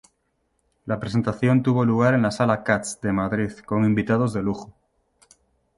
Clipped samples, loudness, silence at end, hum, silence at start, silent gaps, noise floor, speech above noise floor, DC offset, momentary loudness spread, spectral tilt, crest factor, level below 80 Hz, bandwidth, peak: under 0.1%; -22 LUFS; 1.1 s; none; 0.85 s; none; -71 dBFS; 50 dB; under 0.1%; 10 LU; -7 dB/octave; 20 dB; -52 dBFS; 11.5 kHz; -4 dBFS